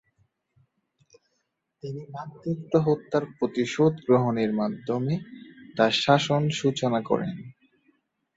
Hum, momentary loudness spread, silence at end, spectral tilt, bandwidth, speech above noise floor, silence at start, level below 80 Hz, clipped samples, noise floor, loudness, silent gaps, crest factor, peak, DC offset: none; 17 LU; 0.85 s; -6 dB/octave; 8 kHz; 52 dB; 1.85 s; -66 dBFS; under 0.1%; -77 dBFS; -25 LUFS; none; 22 dB; -6 dBFS; under 0.1%